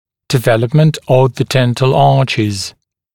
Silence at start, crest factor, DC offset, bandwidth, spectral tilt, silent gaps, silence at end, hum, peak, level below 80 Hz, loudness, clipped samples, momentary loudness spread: 0.3 s; 12 dB; 1%; 18 kHz; -6 dB/octave; none; 0.45 s; none; 0 dBFS; -46 dBFS; -13 LUFS; under 0.1%; 7 LU